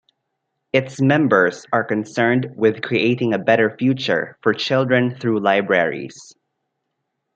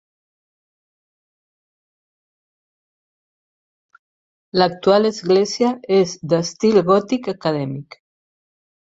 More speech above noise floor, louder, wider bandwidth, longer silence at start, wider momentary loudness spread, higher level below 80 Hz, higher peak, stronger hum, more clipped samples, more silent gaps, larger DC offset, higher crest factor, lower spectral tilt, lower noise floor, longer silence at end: second, 58 dB vs over 73 dB; about the same, -18 LUFS vs -18 LUFS; first, 8.6 kHz vs 7.8 kHz; second, 0.75 s vs 4.55 s; second, 5 LU vs 8 LU; about the same, -66 dBFS vs -62 dBFS; about the same, -2 dBFS vs -2 dBFS; neither; neither; neither; neither; about the same, 18 dB vs 20 dB; about the same, -6.5 dB/octave vs -5.5 dB/octave; second, -76 dBFS vs under -90 dBFS; about the same, 1.1 s vs 1 s